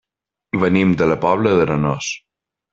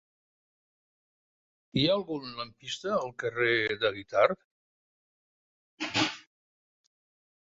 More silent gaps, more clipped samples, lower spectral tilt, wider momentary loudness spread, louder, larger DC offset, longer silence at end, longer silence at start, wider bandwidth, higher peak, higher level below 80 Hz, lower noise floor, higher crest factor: second, none vs 4.45-5.77 s; neither; first, -6 dB/octave vs -4.5 dB/octave; second, 10 LU vs 13 LU; first, -17 LUFS vs -29 LUFS; neither; second, 0.55 s vs 1.35 s; second, 0.55 s vs 1.75 s; about the same, 7.6 kHz vs 7.8 kHz; first, -2 dBFS vs -8 dBFS; first, -48 dBFS vs -66 dBFS; second, -77 dBFS vs under -90 dBFS; second, 16 dB vs 26 dB